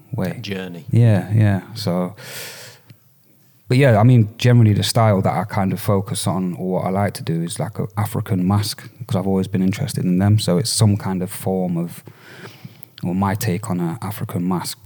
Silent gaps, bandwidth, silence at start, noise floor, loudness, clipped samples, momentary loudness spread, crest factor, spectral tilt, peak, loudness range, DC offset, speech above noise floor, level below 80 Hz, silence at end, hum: none; 19.5 kHz; 0.1 s; -54 dBFS; -19 LUFS; under 0.1%; 15 LU; 16 dB; -6 dB/octave; -2 dBFS; 6 LU; under 0.1%; 35 dB; -58 dBFS; 0.1 s; none